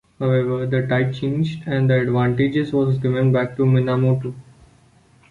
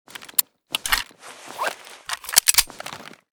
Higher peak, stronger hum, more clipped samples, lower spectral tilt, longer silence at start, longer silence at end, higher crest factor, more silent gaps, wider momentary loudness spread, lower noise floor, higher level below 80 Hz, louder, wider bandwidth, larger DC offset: second, -6 dBFS vs 0 dBFS; neither; neither; first, -9 dB/octave vs 1.5 dB/octave; about the same, 0.2 s vs 0.2 s; first, 0.9 s vs 0.3 s; second, 14 dB vs 26 dB; neither; second, 5 LU vs 21 LU; first, -53 dBFS vs -42 dBFS; about the same, -52 dBFS vs -48 dBFS; about the same, -19 LUFS vs -21 LUFS; second, 4.5 kHz vs over 20 kHz; neither